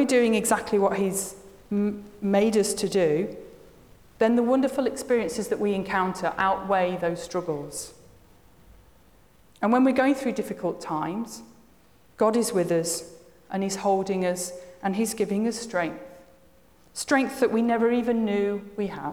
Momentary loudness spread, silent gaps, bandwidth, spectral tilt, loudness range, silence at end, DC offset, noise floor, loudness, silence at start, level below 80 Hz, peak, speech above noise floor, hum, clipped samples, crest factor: 11 LU; none; over 20 kHz; -4.5 dB/octave; 4 LU; 0 s; 0.1%; -58 dBFS; -25 LUFS; 0 s; -60 dBFS; -10 dBFS; 34 dB; none; under 0.1%; 16 dB